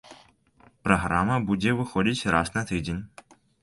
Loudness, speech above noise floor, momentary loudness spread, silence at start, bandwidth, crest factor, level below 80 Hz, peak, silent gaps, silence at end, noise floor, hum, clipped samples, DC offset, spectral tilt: -25 LUFS; 34 dB; 10 LU; 0.1 s; 11.5 kHz; 22 dB; -46 dBFS; -4 dBFS; none; 0.55 s; -59 dBFS; none; under 0.1%; under 0.1%; -5.5 dB/octave